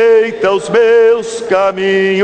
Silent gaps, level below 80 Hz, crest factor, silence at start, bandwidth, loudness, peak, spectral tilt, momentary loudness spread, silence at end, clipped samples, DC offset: none; -54 dBFS; 10 dB; 0 s; 9.4 kHz; -11 LUFS; 0 dBFS; -4.5 dB/octave; 6 LU; 0 s; under 0.1%; under 0.1%